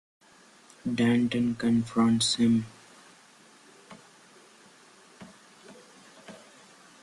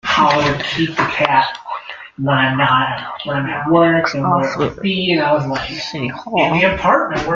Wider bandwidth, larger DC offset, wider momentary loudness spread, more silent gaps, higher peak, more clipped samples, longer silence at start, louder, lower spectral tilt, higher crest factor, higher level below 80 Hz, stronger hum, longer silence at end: first, 11.5 kHz vs 7.6 kHz; neither; first, 27 LU vs 10 LU; neither; second, -14 dBFS vs 0 dBFS; neither; first, 0.85 s vs 0.05 s; second, -26 LUFS vs -16 LUFS; about the same, -4.5 dB/octave vs -5.5 dB/octave; about the same, 16 dB vs 16 dB; second, -64 dBFS vs -44 dBFS; neither; first, 0.65 s vs 0 s